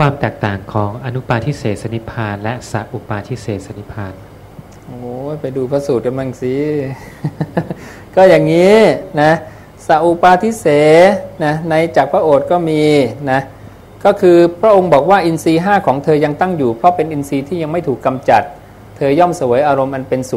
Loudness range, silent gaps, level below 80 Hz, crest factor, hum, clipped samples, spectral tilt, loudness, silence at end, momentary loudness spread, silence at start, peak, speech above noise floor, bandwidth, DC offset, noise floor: 10 LU; none; -44 dBFS; 14 dB; none; 0.2%; -6.5 dB/octave; -13 LUFS; 0 s; 15 LU; 0 s; 0 dBFS; 23 dB; 15.5 kHz; under 0.1%; -36 dBFS